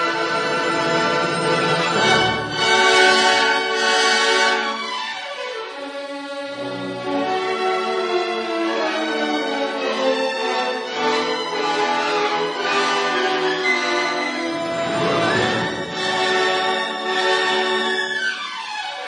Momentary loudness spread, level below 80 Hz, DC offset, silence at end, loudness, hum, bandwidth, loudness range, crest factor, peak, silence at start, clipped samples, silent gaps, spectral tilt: 11 LU; -60 dBFS; under 0.1%; 0 s; -19 LUFS; none; 10.5 kHz; 7 LU; 18 dB; -2 dBFS; 0 s; under 0.1%; none; -3 dB/octave